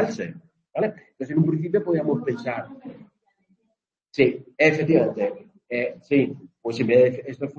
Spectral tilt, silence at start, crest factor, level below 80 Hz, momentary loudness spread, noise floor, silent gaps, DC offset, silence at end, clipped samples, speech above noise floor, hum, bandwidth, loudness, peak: -7.5 dB/octave; 0 s; 20 dB; -66 dBFS; 15 LU; -75 dBFS; none; under 0.1%; 0.05 s; under 0.1%; 53 dB; none; 7.2 kHz; -23 LUFS; -4 dBFS